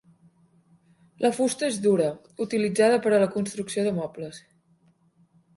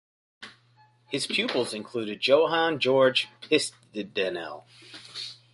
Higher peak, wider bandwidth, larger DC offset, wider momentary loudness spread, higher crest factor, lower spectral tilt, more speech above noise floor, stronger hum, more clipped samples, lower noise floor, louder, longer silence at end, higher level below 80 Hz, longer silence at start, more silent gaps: about the same, -8 dBFS vs -6 dBFS; about the same, 11.5 kHz vs 11.5 kHz; neither; second, 12 LU vs 24 LU; about the same, 18 dB vs 20 dB; first, -5 dB/octave vs -3.5 dB/octave; first, 39 dB vs 35 dB; neither; neither; about the same, -63 dBFS vs -61 dBFS; about the same, -25 LUFS vs -26 LUFS; first, 1.2 s vs 0.2 s; first, -68 dBFS vs -74 dBFS; first, 1.2 s vs 0.4 s; neither